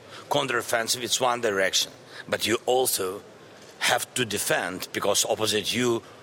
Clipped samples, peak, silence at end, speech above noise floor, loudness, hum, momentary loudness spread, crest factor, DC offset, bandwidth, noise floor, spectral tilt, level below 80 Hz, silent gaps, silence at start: under 0.1%; -8 dBFS; 0 s; 22 dB; -25 LUFS; none; 7 LU; 18 dB; under 0.1%; 17 kHz; -48 dBFS; -2 dB/octave; -68 dBFS; none; 0 s